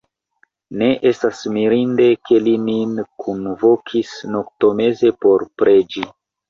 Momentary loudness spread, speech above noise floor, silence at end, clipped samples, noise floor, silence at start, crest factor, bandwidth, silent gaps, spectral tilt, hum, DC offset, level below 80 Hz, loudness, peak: 11 LU; 45 dB; 0.4 s; under 0.1%; -61 dBFS; 0.7 s; 14 dB; 7.4 kHz; none; -6.5 dB/octave; none; under 0.1%; -58 dBFS; -17 LUFS; -2 dBFS